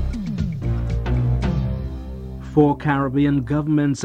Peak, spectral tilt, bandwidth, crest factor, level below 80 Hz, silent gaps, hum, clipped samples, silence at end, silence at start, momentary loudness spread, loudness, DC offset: -4 dBFS; -8 dB/octave; 9.2 kHz; 16 dB; -28 dBFS; none; none; under 0.1%; 0 s; 0 s; 12 LU; -21 LUFS; under 0.1%